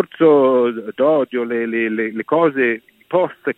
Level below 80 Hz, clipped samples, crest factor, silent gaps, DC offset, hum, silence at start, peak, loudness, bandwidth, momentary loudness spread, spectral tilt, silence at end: -68 dBFS; under 0.1%; 16 dB; none; under 0.1%; none; 0 s; -2 dBFS; -17 LUFS; 4.1 kHz; 8 LU; -8.5 dB/octave; 0.05 s